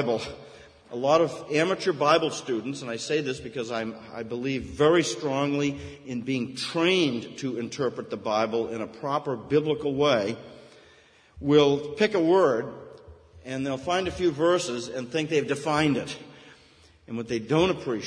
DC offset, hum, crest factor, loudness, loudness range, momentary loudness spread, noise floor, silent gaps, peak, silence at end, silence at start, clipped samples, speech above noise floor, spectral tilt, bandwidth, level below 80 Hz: under 0.1%; none; 20 dB; -26 LUFS; 3 LU; 13 LU; -57 dBFS; none; -6 dBFS; 0 s; 0 s; under 0.1%; 31 dB; -5 dB/octave; 10.5 kHz; -58 dBFS